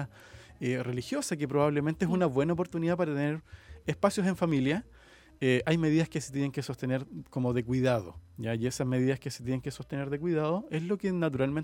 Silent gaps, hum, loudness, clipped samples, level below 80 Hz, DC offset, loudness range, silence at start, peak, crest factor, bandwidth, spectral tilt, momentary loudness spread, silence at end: none; none; -31 LUFS; under 0.1%; -58 dBFS; under 0.1%; 2 LU; 0 s; -10 dBFS; 20 dB; 16.5 kHz; -6.5 dB/octave; 8 LU; 0 s